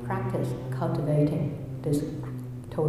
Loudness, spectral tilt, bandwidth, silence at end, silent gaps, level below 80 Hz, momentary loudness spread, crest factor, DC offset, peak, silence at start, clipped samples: -29 LUFS; -8.5 dB/octave; 13.5 kHz; 0 s; none; -52 dBFS; 11 LU; 16 dB; under 0.1%; -14 dBFS; 0 s; under 0.1%